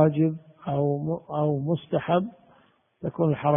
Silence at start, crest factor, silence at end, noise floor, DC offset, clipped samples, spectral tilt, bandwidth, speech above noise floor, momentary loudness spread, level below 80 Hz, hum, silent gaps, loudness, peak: 0 s; 20 dB; 0 s; -61 dBFS; under 0.1%; under 0.1%; -12.5 dB/octave; 3.7 kHz; 37 dB; 11 LU; -62 dBFS; none; none; -27 LUFS; -6 dBFS